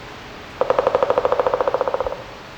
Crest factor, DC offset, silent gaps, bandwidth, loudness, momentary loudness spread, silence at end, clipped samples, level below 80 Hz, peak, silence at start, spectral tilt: 18 dB; under 0.1%; none; 8.6 kHz; -20 LUFS; 17 LU; 0 s; under 0.1%; -46 dBFS; -4 dBFS; 0 s; -5 dB/octave